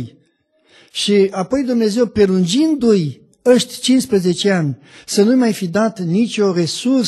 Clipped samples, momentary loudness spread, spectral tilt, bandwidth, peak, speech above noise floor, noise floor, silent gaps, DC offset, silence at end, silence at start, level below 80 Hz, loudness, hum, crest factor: under 0.1%; 7 LU; -5.5 dB/octave; 12.5 kHz; -2 dBFS; 44 dB; -59 dBFS; none; under 0.1%; 0 s; 0 s; -52 dBFS; -16 LUFS; none; 14 dB